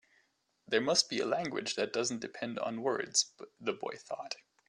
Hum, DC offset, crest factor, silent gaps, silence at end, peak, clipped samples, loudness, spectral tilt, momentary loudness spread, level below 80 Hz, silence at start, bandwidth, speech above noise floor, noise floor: none; under 0.1%; 22 dB; none; 0.35 s; -12 dBFS; under 0.1%; -34 LUFS; -2 dB/octave; 12 LU; -80 dBFS; 0.7 s; 12.5 kHz; 40 dB; -74 dBFS